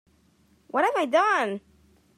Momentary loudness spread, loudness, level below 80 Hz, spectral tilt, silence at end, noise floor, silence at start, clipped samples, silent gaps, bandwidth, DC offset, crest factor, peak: 9 LU; -24 LUFS; -70 dBFS; -4 dB/octave; 0.6 s; -62 dBFS; 0.75 s; under 0.1%; none; 15 kHz; under 0.1%; 16 dB; -10 dBFS